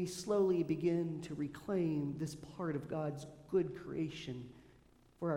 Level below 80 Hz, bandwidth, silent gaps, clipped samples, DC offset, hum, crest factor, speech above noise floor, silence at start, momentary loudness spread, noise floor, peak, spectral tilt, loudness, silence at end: -68 dBFS; 16.5 kHz; none; under 0.1%; under 0.1%; none; 16 dB; 28 dB; 0 s; 11 LU; -66 dBFS; -22 dBFS; -7 dB/octave; -38 LUFS; 0 s